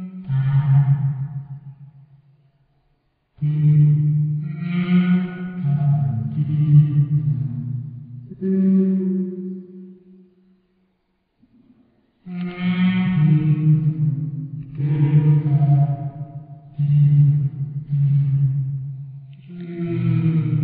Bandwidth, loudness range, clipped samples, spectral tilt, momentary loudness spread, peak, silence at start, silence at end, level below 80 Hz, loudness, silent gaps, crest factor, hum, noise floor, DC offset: 3.9 kHz; 6 LU; under 0.1%; -9.5 dB/octave; 19 LU; -4 dBFS; 0 s; 0 s; -54 dBFS; -19 LUFS; none; 16 dB; none; -68 dBFS; under 0.1%